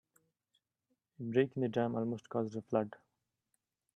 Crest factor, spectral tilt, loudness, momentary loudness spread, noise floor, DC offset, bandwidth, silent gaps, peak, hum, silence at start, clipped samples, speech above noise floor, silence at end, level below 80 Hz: 22 dB; -8 dB/octave; -36 LUFS; 6 LU; -85 dBFS; under 0.1%; 8.4 kHz; none; -16 dBFS; none; 1.2 s; under 0.1%; 50 dB; 1 s; -80 dBFS